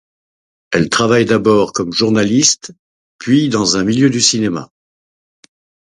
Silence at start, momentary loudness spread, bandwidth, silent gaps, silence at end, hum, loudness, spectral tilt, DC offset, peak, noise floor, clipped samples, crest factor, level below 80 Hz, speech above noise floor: 0.7 s; 9 LU; 11 kHz; 2.79-3.19 s; 1.2 s; none; -13 LUFS; -3.5 dB/octave; under 0.1%; 0 dBFS; under -90 dBFS; under 0.1%; 16 dB; -50 dBFS; over 77 dB